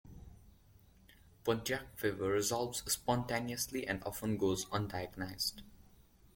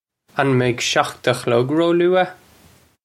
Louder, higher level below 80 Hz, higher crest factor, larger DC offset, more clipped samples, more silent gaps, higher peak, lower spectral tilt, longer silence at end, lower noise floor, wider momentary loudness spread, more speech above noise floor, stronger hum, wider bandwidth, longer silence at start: second, -37 LUFS vs -18 LUFS; about the same, -60 dBFS vs -58 dBFS; about the same, 20 dB vs 18 dB; neither; neither; neither; second, -18 dBFS vs 0 dBFS; about the same, -4 dB/octave vs -5 dB/octave; second, 0.5 s vs 0.7 s; first, -63 dBFS vs -52 dBFS; about the same, 7 LU vs 5 LU; second, 27 dB vs 35 dB; neither; first, 17 kHz vs 14 kHz; second, 0.05 s vs 0.35 s